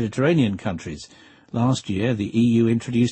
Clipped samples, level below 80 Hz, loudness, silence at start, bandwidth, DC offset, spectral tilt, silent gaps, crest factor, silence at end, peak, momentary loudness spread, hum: under 0.1%; -52 dBFS; -22 LUFS; 0 s; 8.8 kHz; under 0.1%; -7 dB/octave; none; 14 dB; 0 s; -8 dBFS; 13 LU; none